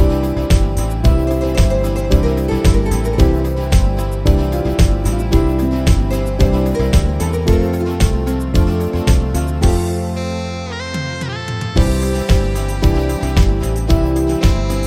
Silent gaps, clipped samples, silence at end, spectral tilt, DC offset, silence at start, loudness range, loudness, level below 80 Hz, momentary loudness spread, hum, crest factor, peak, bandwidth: none; under 0.1%; 0 s; -6.5 dB/octave; under 0.1%; 0 s; 3 LU; -16 LUFS; -16 dBFS; 6 LU; none; 14 dB; 0 dBFS; 16 kHz